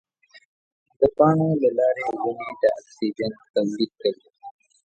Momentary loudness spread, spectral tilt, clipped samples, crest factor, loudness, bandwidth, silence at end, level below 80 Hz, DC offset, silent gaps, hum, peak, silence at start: 10 LU; -7.5 dB/octave; under 0.1%; 20 dB; -23 LUFS; 8.8 kHz; 0.35 s; -58 dBFS; under 0.1%; 3.50-3.54 s; none; -4 dBFS; 1 s